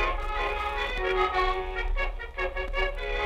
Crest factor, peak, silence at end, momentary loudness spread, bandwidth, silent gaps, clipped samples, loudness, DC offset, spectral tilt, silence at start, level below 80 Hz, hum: 16 dB; -12 dBFS; 0 s; 7 LU; 8.4 kHz; none; under 0.1%; -29 LUFS; under 0.1%; -5 dB/octave; 0 s; -32 dBFS; none